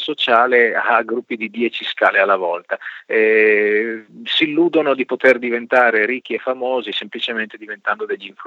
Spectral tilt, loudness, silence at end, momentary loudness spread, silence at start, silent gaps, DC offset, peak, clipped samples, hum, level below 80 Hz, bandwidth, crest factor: -5 dB/octave; -17 LUFS; 0 s; 12 LU; 0 s; none; under 0.1%; 0 dBFS; under 0.1%; none; -80 dBFS; 7.6 kHz; 18 dB